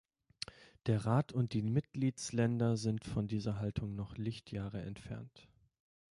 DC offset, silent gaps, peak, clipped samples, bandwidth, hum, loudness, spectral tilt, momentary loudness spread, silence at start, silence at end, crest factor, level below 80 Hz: under 0.1%; none; -20 dBFS; under 0.1%; 11.5 kHz; none; -37 LUFS; -6.5 dB/octave; 14 LU; 0.6 s; 0.7 s; 18 dB; -60 dBFS